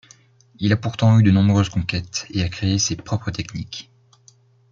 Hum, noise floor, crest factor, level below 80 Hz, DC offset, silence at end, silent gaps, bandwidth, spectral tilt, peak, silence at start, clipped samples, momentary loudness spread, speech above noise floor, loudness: none; -54 dBFS; 18 dB; -48 dBFS; under 0.1%; 0.9 s; none; 7.6 kHz; -5.5 dB/octave; -4 dBFS; 0.6 s; under 0.1%; 15 LU; 35 dB; -20 LUFS